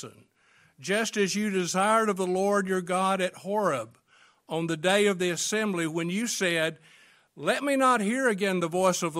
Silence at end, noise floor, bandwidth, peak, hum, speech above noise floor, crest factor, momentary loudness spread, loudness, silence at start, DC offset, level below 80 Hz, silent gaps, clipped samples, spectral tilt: 0 s; -63 dBFS; 16 kHz; -8 dBFS; none; 36 dB; 18 dB; 8 LU; -26 LUFS; 0 s; under 0.1%; -74 dBFS; none; under 0.1%; -4 dB/octave